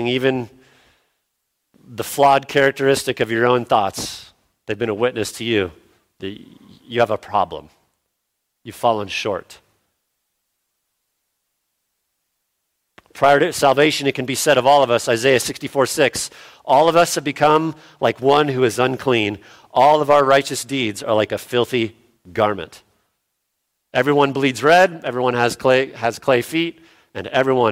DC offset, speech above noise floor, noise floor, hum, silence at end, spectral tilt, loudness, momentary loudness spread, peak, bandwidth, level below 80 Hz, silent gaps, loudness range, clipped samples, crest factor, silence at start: under 0.1%; 58 dB; -75 dBFS; none; 0 s; -4 dB/octave; -18 LUFS; 15 LU; -2 dBFS; 16.5 kHz; -58 dBFS; none; 9 LU; under 0.1%; 18 dB; 0 s